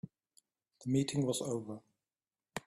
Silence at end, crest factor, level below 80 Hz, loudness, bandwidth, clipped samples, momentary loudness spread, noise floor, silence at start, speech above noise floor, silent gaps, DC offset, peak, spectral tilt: 0.1 s; 20 dB; -72 dBFS; -36 LUFS; 13 kHz; under 0.1%; 17 LU; under -90 dBFS; 0.05 s; over 55 dB; none; under 0.1%; -20 dBFS; -5.5 dB/octave